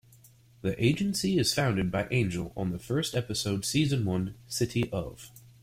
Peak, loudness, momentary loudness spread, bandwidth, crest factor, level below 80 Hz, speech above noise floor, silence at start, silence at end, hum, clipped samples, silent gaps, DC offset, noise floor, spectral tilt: -12 dBFS; -29 LUFS; 9 LU; 16.5 kHz; 18 dB; -54 dBFS; 29 dB; 0.65 s; 0.25 s; none; under 0.1%; none; under 0.1%; -57 dBFS; -5 dB/octave